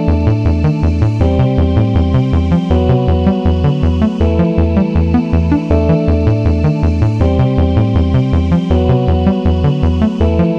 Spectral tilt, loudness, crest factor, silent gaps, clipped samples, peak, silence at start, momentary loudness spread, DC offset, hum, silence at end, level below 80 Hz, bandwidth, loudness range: -9.5 dB/octave; -13 LUFS; 10 dB; none; under 0.1%; 0 dBFS; 0 s; 1 LU; 1%; none; 0 s; -18 dBFS; 6.4 kHz; 0 LU